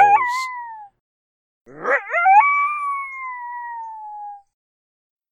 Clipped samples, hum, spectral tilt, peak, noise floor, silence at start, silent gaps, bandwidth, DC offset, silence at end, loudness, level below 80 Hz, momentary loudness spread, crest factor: under 0.1%; none; -2 dB/octave; -2 dBFS; under -90 dBFS; 0 s; 1.00-1.65 s; 12 kHz; under 0.1%; 0.95 s; -19 LUFS; -66 dBFS; 22 LU; 18 dB